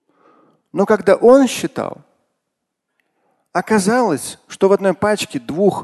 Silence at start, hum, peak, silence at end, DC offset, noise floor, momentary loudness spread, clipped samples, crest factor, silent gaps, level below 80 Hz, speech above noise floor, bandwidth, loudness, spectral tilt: 0.75 s; none; 0 dBFS; 0 s; under 0.1%; -77 dBFS; 14 LU; under 0.1%; 16 dB; none; -56 dBFS; 62 dB; 12.5 kHz; -16 LUFS; -5 dB/octave